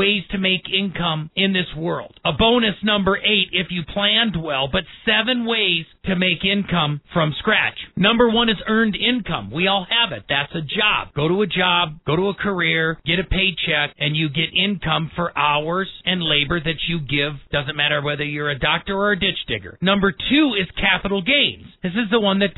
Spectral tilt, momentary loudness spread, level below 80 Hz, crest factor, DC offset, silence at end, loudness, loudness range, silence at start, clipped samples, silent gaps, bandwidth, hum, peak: -8 dB/octave; 6 LU; -40 dBFS; 18 dB; under 0.1%; 0.05 s; -19 LUFS; 2 LU; 0 s; under 0.1%; none; 4.1 kHz; none; -2 dBFS